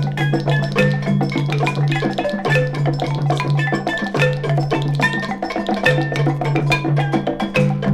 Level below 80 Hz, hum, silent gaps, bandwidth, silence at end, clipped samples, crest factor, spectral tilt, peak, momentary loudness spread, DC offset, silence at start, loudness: -46 dBFS; none; none; 11 kHz; 0 s; under 0.1%; 16 dB; -7 dB/octave; -2 dBFS; 3 LU; under 0.1%; 0 s; -18 LUFS